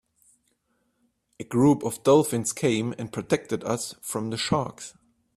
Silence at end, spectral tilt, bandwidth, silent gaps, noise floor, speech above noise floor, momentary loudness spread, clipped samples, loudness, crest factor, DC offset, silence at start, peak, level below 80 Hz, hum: 0.45 s; -5 dB/octave; 15.5 kHz; none; -72 dBFS; 47 dB; 14 LU; under 0.1%; -25 LUFS; 20 dB; under 0.1%; 1.4 s; -6 dBFS; -60 dBFS; none